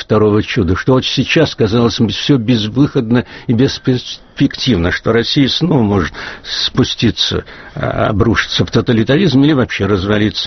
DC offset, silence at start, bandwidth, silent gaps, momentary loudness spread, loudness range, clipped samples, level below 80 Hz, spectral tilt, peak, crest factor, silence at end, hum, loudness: under 0.1%; 0 s; 6.4 kHz; none; 5 LU; 1 LU; under 0.1%; -36 dBFS; -4.5 dB/octave; 0 dBFS; 12 dB; 0 s; none; -13 LUFS